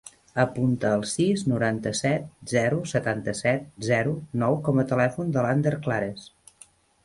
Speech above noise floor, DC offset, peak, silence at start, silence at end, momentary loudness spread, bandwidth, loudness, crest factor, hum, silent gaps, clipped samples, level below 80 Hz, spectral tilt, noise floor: 31 dB; under 0.1%; -8 dBFS; 0.05 s; 0.8 s; 5 LU; 11.5 kHz; -25 LUFS; 18 dB; none; none; under 0.1%; -58 dBFS; -6 dB/octave; -55 dBFS